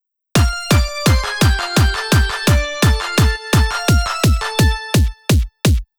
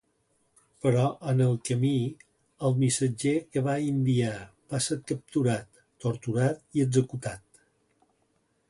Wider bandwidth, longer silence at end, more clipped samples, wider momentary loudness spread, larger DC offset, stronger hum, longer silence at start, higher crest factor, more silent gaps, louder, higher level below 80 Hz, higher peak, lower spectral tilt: first, over 20 kHz vs 11.5 kHz; second, 0.15 s vs 1.3 s; neither; second, 2 LU vs 9 LU; neither; neither; second, 0.35 s vs 0.85 s; about the same, 12 dB vs 16 dB; neither; first, -16 LUFS vs -28 LUFS; first, -20 dBFS vs -62 dBFS; first, -2 dBFS vs -12 dBFS; second, -4.5 dB/octave vs -6 dB/octave